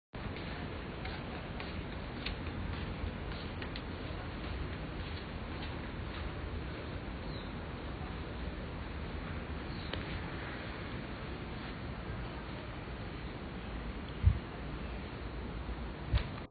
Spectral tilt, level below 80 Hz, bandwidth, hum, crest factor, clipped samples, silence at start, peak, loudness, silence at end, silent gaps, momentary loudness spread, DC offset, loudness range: -5 dB/octave; -44 dBFS; 4.8 kHz; none; 26 dB; under 0.1%; 0.15 s; -14 dBFS; -41 LUFS; 0 s; none; 4 LU; under 0.1%; 3 LU